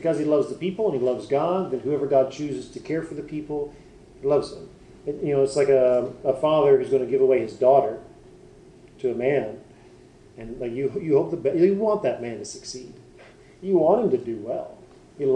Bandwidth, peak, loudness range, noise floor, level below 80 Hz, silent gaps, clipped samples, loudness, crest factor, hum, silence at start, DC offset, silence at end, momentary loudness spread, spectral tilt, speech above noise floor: 9.8 kHz; -6 dBFS; 7 LU; -50 dBFS; -56 dBFS; none; under 0.1%; -23 LUFS; 18 dB; none; 0 s; under 0.1%; 0 s; 16 LU; -6.5 dB/octave; 27 dB